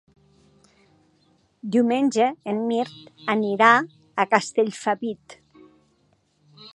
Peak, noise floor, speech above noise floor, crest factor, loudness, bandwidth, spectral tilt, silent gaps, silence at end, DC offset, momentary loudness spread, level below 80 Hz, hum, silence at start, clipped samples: -2 dBFS; -65 dBFS; 43 dB; 24 dB; -22 LUFS; 11 kHz; -4.5 dB/octave; none; 0.05 s; under 0.1%; 16 LU; -74 dBFS; none; 1.65 s; under 0.1%